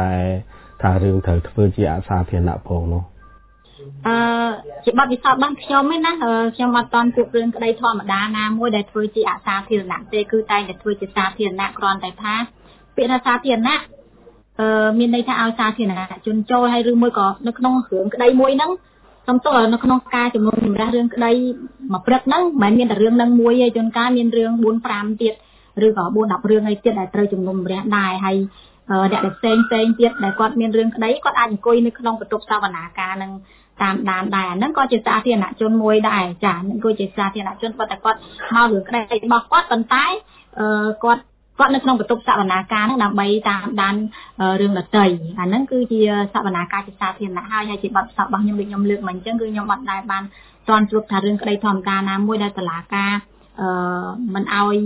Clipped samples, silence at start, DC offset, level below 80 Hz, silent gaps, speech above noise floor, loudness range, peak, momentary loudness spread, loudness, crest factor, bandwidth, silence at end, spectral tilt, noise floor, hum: under 0.1%; 0 s; under 0.1%; -40 dBFS; none; 31 dB; 4 LU; 0 dBFS; 9 LU; -18 LUFS; 18 dB; 4 kHz; 0 s; -10 dB/octave; -48 dBFS; none